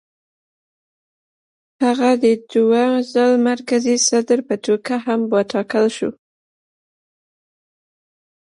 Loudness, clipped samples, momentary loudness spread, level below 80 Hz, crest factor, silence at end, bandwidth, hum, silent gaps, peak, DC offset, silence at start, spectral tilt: -17 LUFS; under 0.1%; 5 LU; -70 dBFS; 16 dB; 2.35 s; 11.5 kHz; none; none; -4 dBFS; under 0.1%; 1.8 s; -3.5 dB/octave